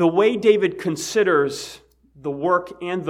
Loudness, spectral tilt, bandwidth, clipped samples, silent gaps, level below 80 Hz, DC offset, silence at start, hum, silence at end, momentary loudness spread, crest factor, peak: -20 LUFS; -5 dB/octave; 15.5 kHz; under 0.1%; none; -60 dBFS; under 0.1%; 0 s; none; 0 s; 14 LU; 18 dB; -2 dBFS